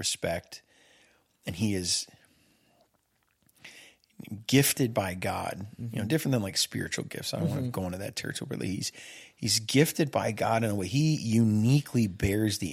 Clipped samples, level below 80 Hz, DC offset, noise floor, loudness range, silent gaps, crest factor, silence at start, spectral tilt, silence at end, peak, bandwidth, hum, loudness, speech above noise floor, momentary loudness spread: under 0.1%; -58 dBFS; under 0.1%; -72 dBFS; 9 LU; none; 22 dB; 0 s; -4.5 dB/octave; 0 s; -8 dBFS; 16.5 kHz; none; -28 LUFS; 44 dB; 16 LU